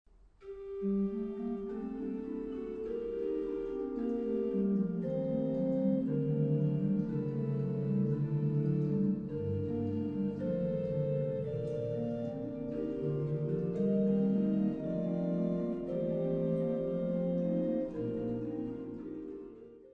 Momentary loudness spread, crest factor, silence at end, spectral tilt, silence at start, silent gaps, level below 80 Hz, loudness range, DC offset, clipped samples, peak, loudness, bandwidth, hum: 8 LU; 14 dB; 0 s; -11.5 dB/octave; 0.4 s; none; -60 dBFS; 4 LU; under 0.1%; under 0.1%; -20 dBFS; -34 LUFS; 4.6 kHz; none